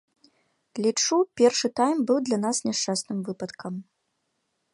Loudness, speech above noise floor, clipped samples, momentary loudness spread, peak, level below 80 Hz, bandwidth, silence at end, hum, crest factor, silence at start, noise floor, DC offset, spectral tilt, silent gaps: -25 LUFS; 51 dB; under 0.1%; 15 LU; -6 dBFS; -74 dBFS; 11.5 kHz; 0.9 s; none; 20 dB; 0.75 s; -76 dBFS; under 0.1%; -3.5 dB/octave; none